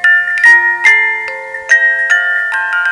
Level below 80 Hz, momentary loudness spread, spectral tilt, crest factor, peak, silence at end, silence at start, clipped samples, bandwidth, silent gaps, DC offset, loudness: -58 dBFS; 10 LU; 1 dB/octave; 10 dB; 0 dBFS; 0 s; 0 s; 0.4%; 11 kHz; none; under 0.1%; -8 LUFS